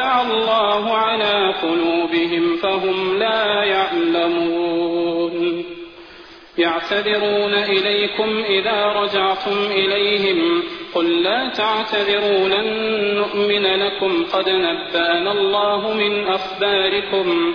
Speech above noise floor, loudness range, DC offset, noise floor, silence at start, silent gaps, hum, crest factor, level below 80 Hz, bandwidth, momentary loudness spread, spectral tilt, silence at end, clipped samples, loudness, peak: 23 dB; 2 LU; under 0.1%; -41 dBFS; 0 s; none; none; 14 dB; -56 dBFS; 5.4 kHz; 4 LU; -5.5 dB/octave; 0 s; under 0.1%; -18 LUFS; -6 dBFS